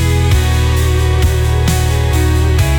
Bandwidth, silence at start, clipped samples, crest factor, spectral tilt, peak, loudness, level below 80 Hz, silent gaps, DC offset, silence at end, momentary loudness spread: 19 kHz; 0 s; under 0.1%; 8 dB; -5.5 dB/octave; -2 dBFS; -13 LUFS; -18 dBFS; none; under 0.1%; 0 s; 1 LU